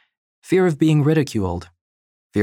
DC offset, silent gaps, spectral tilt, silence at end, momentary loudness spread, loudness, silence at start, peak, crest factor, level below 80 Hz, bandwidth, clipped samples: under 0.1%; 1.81-2.30 s; -7.5 dB/octave; 0 s; 11 LU; -19 LUFS; 0.5 s; -4 dBFS; 16 dB; -50 dBFS; 13.5 kHz; under 0.1%